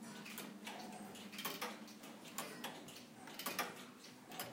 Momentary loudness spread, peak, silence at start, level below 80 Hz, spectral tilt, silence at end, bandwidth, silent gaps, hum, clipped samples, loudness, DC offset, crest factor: 10 LU; -26 dBFS; 0 s; under -90 dBFS; -2.5 dB/octave; 0 s; 17 kHz; none; none; under 0.1%; -48 LUFS; under 0.1%; 22 dB